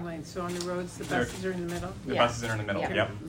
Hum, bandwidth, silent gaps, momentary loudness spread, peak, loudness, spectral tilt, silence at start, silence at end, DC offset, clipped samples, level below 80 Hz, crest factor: none; 16 kHz; none; 9 LU; -10 dBFS; -31 LUFS; -5 dB/octave; 0 s; 0 s; under 0.1%; under 0.1%; -52 dBFS; 20 dB